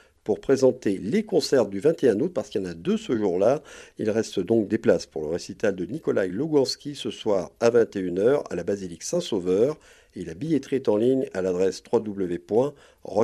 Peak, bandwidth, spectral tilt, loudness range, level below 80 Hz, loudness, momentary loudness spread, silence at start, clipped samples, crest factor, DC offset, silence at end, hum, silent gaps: -6 dBFS; 13.5 kHz; -5.5 dB/octave; 2 LU; -60 dBFS; -25 LUFS; 9 LU; 0.25 s; under 0.1%; 18 dB; under 0.1%; 0 s; none; none